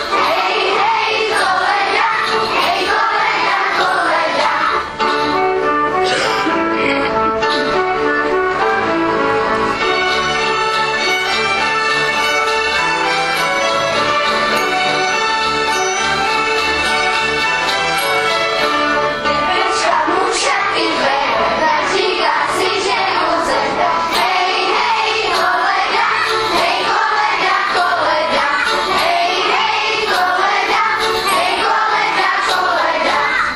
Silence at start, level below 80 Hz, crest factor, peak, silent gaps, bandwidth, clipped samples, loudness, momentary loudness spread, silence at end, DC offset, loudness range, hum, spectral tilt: 0 s; -44 dBFS; 14 dB; 0 dBFS; none; 15 kHz; under 0.1%; -14 LUFS; 1 LU; 0 s; under 0.1%; 1 LU; none; -2 dB/octave